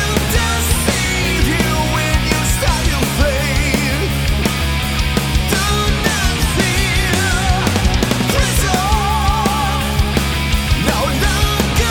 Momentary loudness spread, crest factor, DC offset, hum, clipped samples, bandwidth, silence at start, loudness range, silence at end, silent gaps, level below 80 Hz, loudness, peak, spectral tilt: 2 LU; 12 dB; under 0.1%; none; under 0.1%; 19 kHz; 0 s; 1 LU; 0 s; none; -20 dBFS; -15 LUFS; -2 dBFS; -4 dB/octave